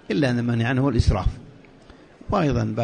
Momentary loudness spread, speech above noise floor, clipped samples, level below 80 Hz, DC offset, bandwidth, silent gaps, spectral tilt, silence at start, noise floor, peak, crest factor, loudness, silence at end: 7 LU; 27 dB; under 0.1%; -32 dBFS; under 0.1%; 9.8 kHz; none; -7.5 dB/octave; 0.1 s; -48 dBFS; -6 dBFS; 16 dB; -22 LUFS; 0 s